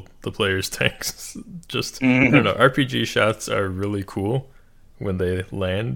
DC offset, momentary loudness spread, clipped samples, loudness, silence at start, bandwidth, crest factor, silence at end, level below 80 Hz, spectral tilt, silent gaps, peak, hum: under 0.1%; 13 LU; under 0.1%; -21 LUFS; 0 s; 17.5 kHz; 22 dB; 0 s; -48 dBFS; -5 dB/octave; none; 0 dBFS; none